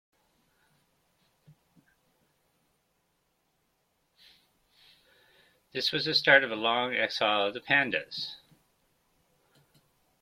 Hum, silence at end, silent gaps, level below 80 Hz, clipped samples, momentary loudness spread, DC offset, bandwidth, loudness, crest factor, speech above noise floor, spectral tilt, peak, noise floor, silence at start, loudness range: none; 1.85 s; none; -76 dBFS; under 0.1%; 16 LU; under 0.1%; 16 kHz; -26 LUFS; 28 dB; 48 dB; -3.5 dB/octave; -6 dBFS; -75 dBFS; 5.75 s; 7 LU